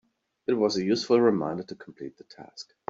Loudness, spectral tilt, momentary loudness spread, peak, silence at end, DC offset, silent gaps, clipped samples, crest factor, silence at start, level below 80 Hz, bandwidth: -25 LUFS; -5.5 dB/octave; 21 LU; -10 dBFS; 0.3 s; under 0.1%; none; under 0.1%; 18 dB; 0.5 s; -70 dBFS; 7.8 kHz